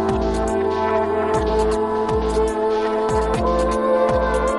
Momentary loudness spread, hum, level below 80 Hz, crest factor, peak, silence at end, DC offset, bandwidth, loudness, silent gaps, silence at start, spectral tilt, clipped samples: 3 LU; none; -30 dBFS; 12 dB; -6 dBFS; 0 s; 0.2%; 11.5 kHz; -20 LUFS; none; 0 s; -6 dB/octave; under 0.1%